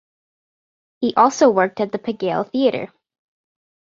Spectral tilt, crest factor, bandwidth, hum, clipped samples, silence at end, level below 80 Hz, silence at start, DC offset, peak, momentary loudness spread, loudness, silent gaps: -5 dB/octave; 20 dB; 7.6 kHz; none; under 0.1%; 1.1 s; -66 dBFS; 1 s; under 0.1%; -2 dBFS; 11 LU; -18 LUFS; none